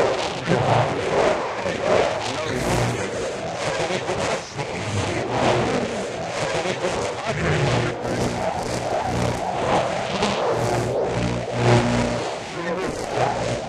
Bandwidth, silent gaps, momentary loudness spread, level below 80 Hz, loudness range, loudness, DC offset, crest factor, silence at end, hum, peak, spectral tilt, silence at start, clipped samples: 13.5 kHz; none; 6 LU; -42 dBFS; 2 LU; -23 LUFS; under 0.1%; 18 dB; 0 s; none; -4 dBFS; -5 dB/octave; 0 s; under 0.1%